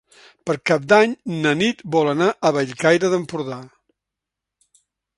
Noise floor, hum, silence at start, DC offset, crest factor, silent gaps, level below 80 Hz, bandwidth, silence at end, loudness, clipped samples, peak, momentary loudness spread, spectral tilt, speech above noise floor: -85 dBFS; none; 0.45 s; under 0.1%; 20 dB; none; -64 dBFS; 11.5 kHz; 1.5 s; -19 LUFS; under 0.1%; 0 dBFS; 13 LU; -5 dB/octave; 66 dB